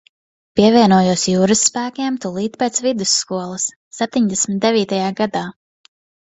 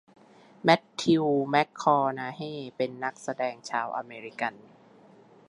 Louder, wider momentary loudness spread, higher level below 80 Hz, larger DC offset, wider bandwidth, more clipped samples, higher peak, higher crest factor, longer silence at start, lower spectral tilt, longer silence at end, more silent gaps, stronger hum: first, -17 LUFS vs -28 LUFS; about the same, 11 LU vs 11 LU; first, -54 dBFS vs -76 dBFS; neither; second, 8.4 kHz vs 11.5 kHz; neither; first, 0 dBFS vs -6 dBFS; about the same, 18 dB vs 22 dB; about the same, 0.55 s vs 0.65 s; second, -4 dB/octave vs -5.5 dB/octave; second, 0.75 s vs 0.9 s; first, 3.76-3.91 s vs none; neither